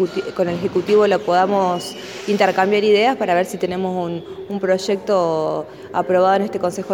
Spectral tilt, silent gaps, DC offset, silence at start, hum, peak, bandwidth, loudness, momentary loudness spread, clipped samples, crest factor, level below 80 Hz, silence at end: -5.5 dB/octave; none; under 0.1%; 0 s; none; -2 dBFS; 17.5 kHz; -18 LUFS; 10 LU; under 0.1%; 16 dB; -58 dBFS; 0 s